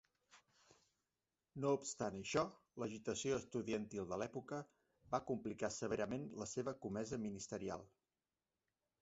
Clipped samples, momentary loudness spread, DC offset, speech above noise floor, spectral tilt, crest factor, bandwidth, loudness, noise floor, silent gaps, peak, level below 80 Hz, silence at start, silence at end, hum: under 0.1%; 8 LU; under 0.1%; over 46 dB; -5 dB/octave; 22 dB; 8 kHz; -44 LUFS; under -90 dBFS; none; -24 dBFS; -72 dBFS; 0.35 s; 1.15 s; none